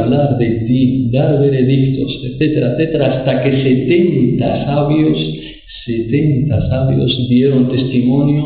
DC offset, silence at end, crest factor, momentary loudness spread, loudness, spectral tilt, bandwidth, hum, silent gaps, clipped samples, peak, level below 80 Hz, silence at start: 0.4%; 0 s; 10 dB; 6 LU; -14 LUFS; -13 dB/octave; 4.8 kHz; none; none; under 0.1%; -2 dBFS; -38 dBFS; 0 s